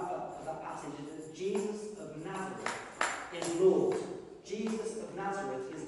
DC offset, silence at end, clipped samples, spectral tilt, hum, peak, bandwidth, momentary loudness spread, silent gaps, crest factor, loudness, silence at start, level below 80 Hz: under 0.1%; 0 s; under 0.1%; -4.5 dB/octave; none; -16 dBFS; 11.5 kHz; 15 LU; none; 20 dB; -36 LUFS; 0 s; -70 dBFS